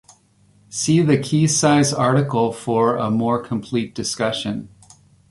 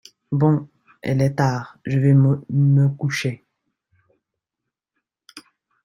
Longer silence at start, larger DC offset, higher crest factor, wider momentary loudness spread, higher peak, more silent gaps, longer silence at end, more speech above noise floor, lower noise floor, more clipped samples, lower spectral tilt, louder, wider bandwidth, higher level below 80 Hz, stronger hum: first, 0.7 s vs 0.3 s; neither; about the same, 16 dB vs 18 dB; second, 9 LU vs 12 LU; about the same, -2 dBFS vs -4 dBFS; neither; first, 0.65 s vs 0.45 s; second, 37 dB vs 66 dB; second, -56 dBFS vs -84 dBFS; neither; second, -5 dB/octave vs -7.5 dB/octave; about the same, -19 LUFS vs -20 LUFS; first, 11.5 kHz vs 10 kHz; about the same, -56 dBFS vs -58 dBFS; neither